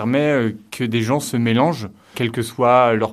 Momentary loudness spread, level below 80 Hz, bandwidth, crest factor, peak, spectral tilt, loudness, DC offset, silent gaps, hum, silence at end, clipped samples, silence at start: 11 LU; -58 dBFS; 15 kHz; 16 dB; -2 dBFS; -6 dB/octave; -18 LUFS; under 0.1%; none; none; 0 s; under 0.1%; 0 s